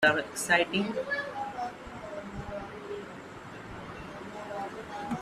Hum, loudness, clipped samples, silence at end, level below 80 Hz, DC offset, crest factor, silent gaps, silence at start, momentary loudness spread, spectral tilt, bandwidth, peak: none; -33 LUFS; under 0.1%; 0 s; -58 dBFS; under 0.1%; 24 dB; none; 0 s; 17 LU; -3.5 dB/octave; 15 kHz; -10 dBFS